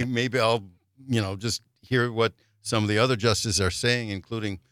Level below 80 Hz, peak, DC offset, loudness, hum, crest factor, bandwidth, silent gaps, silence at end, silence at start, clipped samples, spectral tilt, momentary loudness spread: -56 dBFS; -6 dBFS; under 0.1%; -25 LUFS; none; 20 dB; 15.5 kHz; none; 0.15 s; 0 s; under 0.1%; -4.5 dB/octave; 9 LU